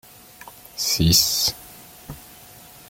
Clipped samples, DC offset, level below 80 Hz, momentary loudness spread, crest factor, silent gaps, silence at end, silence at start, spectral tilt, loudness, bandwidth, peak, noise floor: under 0.1%; under 0.1%; -42 dBFS; 26 LU; 20 dB; none; 0.7 s; 0.45 s; -2.5 dB/octave; -18 LUFS; 17 kHz; -4 dBFS; -45 dBFS